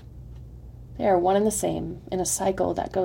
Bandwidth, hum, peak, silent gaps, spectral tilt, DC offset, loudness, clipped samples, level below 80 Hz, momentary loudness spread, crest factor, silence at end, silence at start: 16.5 kHz; none; -8 dBFS; none; -4.5 dB/octave; under 0.1%; -25 LUFS; under 0.1%; -46 dBFS; 23 LU; 16 dB; 0 s; 0 s